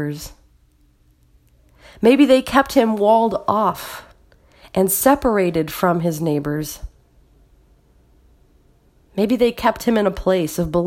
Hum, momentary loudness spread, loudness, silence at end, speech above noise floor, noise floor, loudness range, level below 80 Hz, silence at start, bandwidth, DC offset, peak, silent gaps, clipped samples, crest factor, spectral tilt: none; 16 LU; -18 LUFS; 0 s; 39 dB; -56 dBFS; 8 LU; -44 dBFS; 0 s; 16.5 kHz; under 0.1%; 0 dBFS; none; under 0.1%; 20 dB; -5.5 dB/octave